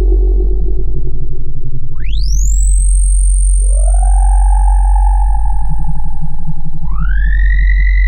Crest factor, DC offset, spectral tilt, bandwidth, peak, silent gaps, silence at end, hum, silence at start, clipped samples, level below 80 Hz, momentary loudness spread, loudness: 6 dB; under 0.1%; -5 dB/octave; 9.6 kHz; -2 dBFS; none; 0 s; none; 0 s; under 0.1%; -10 dBFS; 11 LU; -15 LUFS